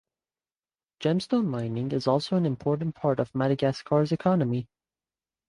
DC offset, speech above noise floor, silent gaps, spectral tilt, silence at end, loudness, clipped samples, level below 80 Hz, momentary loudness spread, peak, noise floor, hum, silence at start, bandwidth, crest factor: under 0.1%; over 64 dB; none; -8 dB/octave; 0.85 s; -27 LUFS; under 0.1%; -62 dBFS; 5 LU; -10 dBFS; under -90 dBFS; none; 1 s; 11 kHz; 18 dB